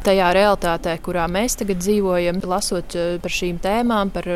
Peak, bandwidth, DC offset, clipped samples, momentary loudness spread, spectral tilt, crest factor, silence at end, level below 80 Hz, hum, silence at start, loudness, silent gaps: -4 dBFS; 16 kHz; under 0.1%; under 0.1%; 7 LU; -4.5 dB/octave; 14 dB; 0 s; -36 dBFS; none; 0 s; -20 LUFS; none